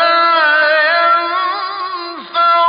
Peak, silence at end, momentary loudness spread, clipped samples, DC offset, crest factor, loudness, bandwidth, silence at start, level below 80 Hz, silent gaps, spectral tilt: -2 dBFS; 0 s; 11 LU; under 0.1%; under 0.1%; 10 dB; -12 LUFS; 5.2 kHz; 0 s; -72 dBFS; none; -5.5 dB/octave